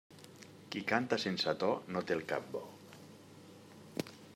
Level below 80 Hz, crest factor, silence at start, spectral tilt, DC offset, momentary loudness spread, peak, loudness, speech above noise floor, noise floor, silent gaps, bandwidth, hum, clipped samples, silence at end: -80 dBFS; 24 dB; 0.1 s; -4.5 dB/octave; under 0.1%; 22 LU; -14 dBFS; -37 LUFS; 20 dB; -56 dBFS; none; 16 kHz; none; under 0.1%; 0 s